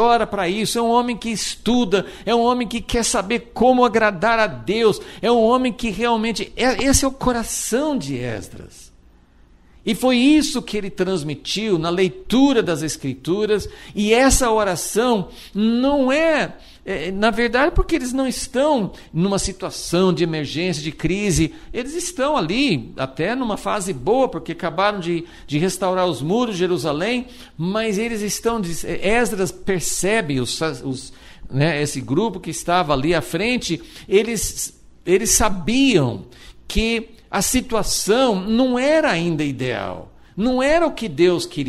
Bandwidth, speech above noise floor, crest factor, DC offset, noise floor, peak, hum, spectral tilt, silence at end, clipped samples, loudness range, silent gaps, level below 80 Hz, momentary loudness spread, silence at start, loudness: 14.5 kHz; 31 dB; 18 dB; under 0.1%; -50 dBFS; 0 dBFS; none; -4 dB/octave; 0 s; under 0.1%; 3 LU; none; -36 dBFS; 10 LU; 0 s; -20 LUFS